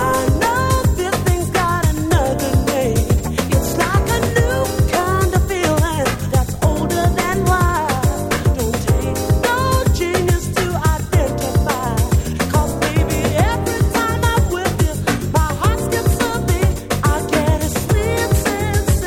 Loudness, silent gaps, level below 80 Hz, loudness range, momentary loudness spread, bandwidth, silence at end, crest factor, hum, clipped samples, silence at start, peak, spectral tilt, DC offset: -17 LUFS; none; -24 dBFS; 1 LU; 2 LU; 17.5 kHz; 0 s; 14 dB; none; under 0.1%; 0 s; -2 dBFS; -5.5 dB/octave; under 0.1%